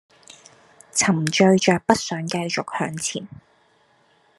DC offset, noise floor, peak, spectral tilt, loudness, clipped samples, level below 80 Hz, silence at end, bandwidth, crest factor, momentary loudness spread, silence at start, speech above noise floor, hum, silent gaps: under 0.1%; -60 dBFS; 0 dBFS; -4 dB/octave; -21 LUFS; under 0.1%; -62 dBFS; 1.1 s; 12.5 kHz; 22 dB; 11 LU; 0.3 s; 39 dB; none; none